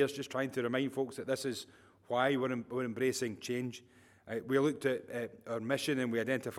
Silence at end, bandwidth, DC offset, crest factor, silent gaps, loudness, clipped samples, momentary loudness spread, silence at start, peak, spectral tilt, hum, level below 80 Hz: 0 s; 16 kHz; under 0.1%; 20 dB; none; -35 LUFS; under 0.1%; 10 LU; 0 s; -16 dBFS; -5 dB/octave; none; -78 dBFS